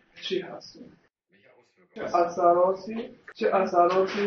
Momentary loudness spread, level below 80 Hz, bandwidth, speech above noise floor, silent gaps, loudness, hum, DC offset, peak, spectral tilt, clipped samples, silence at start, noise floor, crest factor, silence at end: 20 LU; -70 dBFS; 6.6 kHz; 36 dB; none; -25 LUFS; none; under 0.1%; -6 dBFS; -3.5 dB/octave; under 0.1%; 0.15 s; -62 dBFS; 20 dB; 0 s